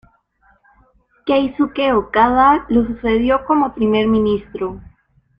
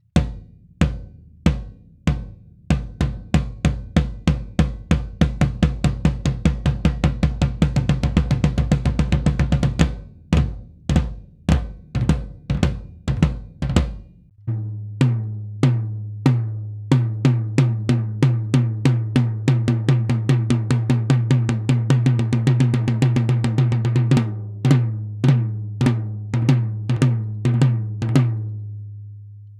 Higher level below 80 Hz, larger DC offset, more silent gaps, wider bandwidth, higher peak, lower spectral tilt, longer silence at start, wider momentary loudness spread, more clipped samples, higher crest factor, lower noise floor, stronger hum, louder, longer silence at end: second, -40 dBFS vs -28 dBFS; neither; neither; second, 5.2 kHz vs 10.5 kHz; about the same, -2 dBFS vs 0 dBFS; about the same, -8.5 dB/octave vs -7.5 dB/octave; first, 1.25 s vs 0.15 s; first, 13 LU vs 10 LU; neither; about the same, 16 dB vs 20 dB; first, -57 dBFS vs -39 dBFS; neither; first, -16 LUFS vs -21 LUFS; first, 0.6 s vs 0 s